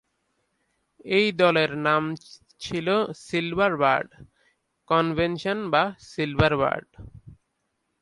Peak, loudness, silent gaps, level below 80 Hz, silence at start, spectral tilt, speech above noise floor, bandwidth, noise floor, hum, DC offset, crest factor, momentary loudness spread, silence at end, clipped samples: -6 dBFS; -24 LUFS; none; -50 dBFS; 1.05 s; -6 dB/octave; 52 dB; 11.5 kHz; -76 dBFS; none; under 0.1%; 20 dB; 11 LU; 0.65 s; under 0.1%